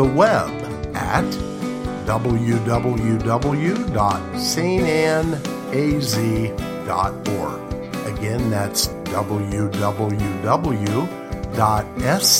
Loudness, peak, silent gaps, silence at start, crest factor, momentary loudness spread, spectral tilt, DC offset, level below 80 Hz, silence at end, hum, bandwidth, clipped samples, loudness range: -21 LUFS; -2 dBFS; none; 0 s; 18 dB; 8 LU; -5 dB/octave; under 0.1%; -36 dBFS; 0 s; none; 16.5 kHz; under 0.1%; 3 LU